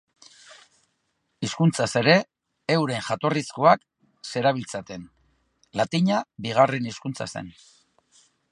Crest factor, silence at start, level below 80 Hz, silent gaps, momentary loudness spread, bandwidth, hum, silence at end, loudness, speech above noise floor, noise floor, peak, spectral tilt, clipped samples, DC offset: 24 dB; 0.5 s; -64 dBFS; none; 16 LU; 11.5 kHz; none; 1 s; -24 LUFS; 51 dB; -74 dBFS; -2 dBFS; -5.5 dB/octave; under 0.1%; under 0.1%